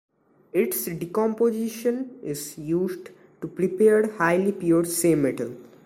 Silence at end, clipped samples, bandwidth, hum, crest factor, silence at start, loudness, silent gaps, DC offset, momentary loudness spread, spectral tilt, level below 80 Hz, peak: 0.2 s; under 0.1%; 16.5 kHz; none; 18 dB; 0.55 s; -24 LUFS; none; under 0.1%; 12 LU; -5.5 dB/octave; -62 dBFS; -6 dBFS